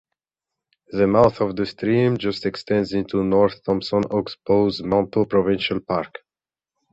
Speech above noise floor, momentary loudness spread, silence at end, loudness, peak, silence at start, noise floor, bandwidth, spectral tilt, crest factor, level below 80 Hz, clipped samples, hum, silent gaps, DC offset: over 70 dB; 7 LU; 0.85 s; -21 LUFS; -2 dBFS; 0.9 s; under -90 dBFS; 8 kHz; -7.5 dB/octave; 20 dB; -50 dBFS; under 0.1%; none; none; under 0.1%